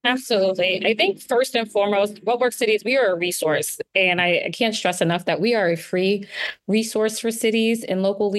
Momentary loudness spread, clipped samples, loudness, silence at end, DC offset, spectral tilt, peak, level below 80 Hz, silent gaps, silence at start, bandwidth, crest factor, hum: 4 LU; under 0.1%; -21 LUFS; 0 s; under 0.1%; -3.5 dB/octave; -4 dBFS; -68 dBFS; none; 0.05 s; 13 kHz; 16 dB; none